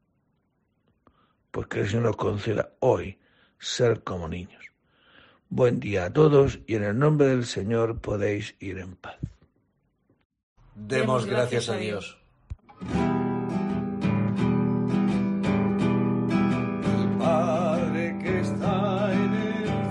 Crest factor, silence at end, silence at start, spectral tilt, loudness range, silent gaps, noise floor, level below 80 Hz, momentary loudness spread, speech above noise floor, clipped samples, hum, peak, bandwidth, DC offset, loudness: 20 dB; 0 s; 1.55 s; -7 dB/octave; 6 LU; 10.25-10.30 s, 10.43-10.56 s; -72 dBFS; -50 dBFS; 14 LU; 47 dB; under 0.1%; none; -6 dBFS; 11 kHz; under 0.1%; -25 LUFS